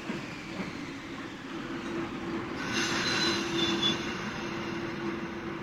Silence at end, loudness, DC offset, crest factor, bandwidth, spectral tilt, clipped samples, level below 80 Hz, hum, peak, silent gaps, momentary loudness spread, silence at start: 0 s; -32 LUFS; under 0.1%; 18 dB; 15.5 kHz; -3.5 dB/octave; under 0.1%; -58 dBFS; none; -16 dBFS; none; 12 LU; 0 s